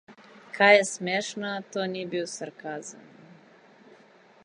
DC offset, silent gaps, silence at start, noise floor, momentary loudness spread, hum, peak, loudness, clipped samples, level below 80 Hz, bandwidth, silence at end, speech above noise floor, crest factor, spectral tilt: under 0.1%; none; 0.1 s; -56 dBFS; 19 LU; none; -4 dBFS; -25 LUFS; under 0.1%; -82 dBFS; 11 kHz; 1.45 s; 30 dB; 24 dB; -3 dB/octave